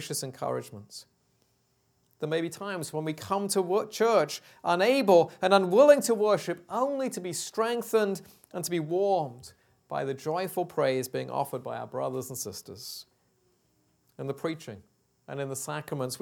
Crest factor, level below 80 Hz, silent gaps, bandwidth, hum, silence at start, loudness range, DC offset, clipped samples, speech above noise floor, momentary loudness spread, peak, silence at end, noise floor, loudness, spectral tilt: 24 dB; -76 dBFS; none; 19 kHz; none; 0 s; 14 LU; under 0.1%; under 0.1%; 43 dB; 18 LU; -6 dBFS; 0.05 s; -71 dBFS; -28 LUFS; -4.5 dB/octave